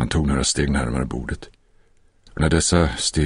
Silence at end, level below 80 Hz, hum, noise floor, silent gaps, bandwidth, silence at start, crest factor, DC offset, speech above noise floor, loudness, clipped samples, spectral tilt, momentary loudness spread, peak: 0 s; -30 dBFS; none; -55 dBFS; none; 11 kHz; 0 s; 18 dB; under 0.1%; 35 dB; -21 LUFS; under 0.1%; -4.5 dB/octave; 14 LU; -4 dBFS